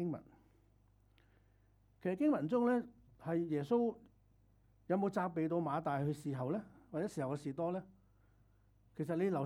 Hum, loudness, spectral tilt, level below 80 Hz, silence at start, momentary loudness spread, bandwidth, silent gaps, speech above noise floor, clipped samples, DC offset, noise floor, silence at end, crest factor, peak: none; -38 LUFS; -8.5 dB/octave; -72 dBFS; 0 s; 12 LU; 13 kHz; none; 33 dB; under 0.1%; under 0.1%; -70 dBFS; 0 s; 16 dB; -22 dBFS